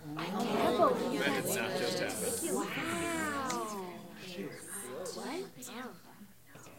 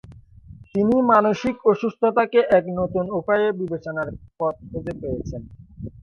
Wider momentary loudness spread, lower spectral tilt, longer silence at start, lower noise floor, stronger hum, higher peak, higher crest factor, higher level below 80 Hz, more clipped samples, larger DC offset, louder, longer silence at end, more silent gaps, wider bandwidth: about the same, 16 LU vs 15 LU; second, -3.5 dB/octave vs -7.5 dB/octave; about the same, 0 s vs 0.1 s; first, -56 dBFS vs -45 dBFS; neither; second, -16 dBFS vs -4 dBFS; about the same, 20 dB vs 18 dB; second, -72 dBFS vs -48 dBFS; neither; neither; second, -35 LUFS vs -21 LUFS; about the same, 0 s vs 0 s; neither; first, 16.5 kHz vs 7 kHz